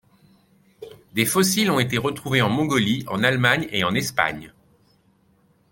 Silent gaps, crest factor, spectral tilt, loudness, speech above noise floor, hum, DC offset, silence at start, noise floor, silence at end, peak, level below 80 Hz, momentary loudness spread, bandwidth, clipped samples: none; 22 dB; -4 dB/octave; -21 LUFS; 40 dB; none; under 0.1%; 0.8 s; -61 dBFS; 1.25 s; -2 dBFS; -56 dBFS; 6 LU; 17 kHz; under 0.1%